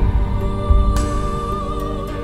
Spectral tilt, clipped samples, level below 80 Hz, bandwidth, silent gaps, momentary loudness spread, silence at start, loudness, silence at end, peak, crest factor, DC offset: -7 dB/octave; under 0.1%; -20 dBFS; 13.5 kHz; none; 7 LU; 0 s; -21 LUFS; 0 s; -2 dBFS; 16 dB; under 0.1%